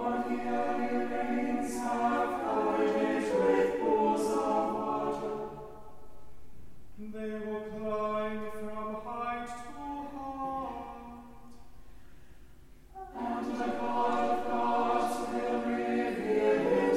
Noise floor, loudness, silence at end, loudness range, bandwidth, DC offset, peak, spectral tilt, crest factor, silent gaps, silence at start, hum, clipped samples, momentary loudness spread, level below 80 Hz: -54 dBFS; -32 LUFS; 0 s; 12 LU; 16 kHz; under 0.1%; -16 dBFS; -5.5 dB/octave; 16 dB; none; 0 s; none; under 0.1%; 14 LU; -58 dBFS